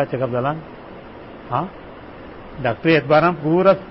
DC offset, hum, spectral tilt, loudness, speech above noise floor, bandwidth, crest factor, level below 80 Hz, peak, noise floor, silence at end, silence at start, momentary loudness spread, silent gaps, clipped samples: 0.1%; none; -11 dB/octave; -18 LUFS; 20 dB; 5.8 kHz; 18 dB; -48 dBFS; -2 dBFS; -37 dBFS; 0 s; 0 s; 23 LU; none; under 0.1%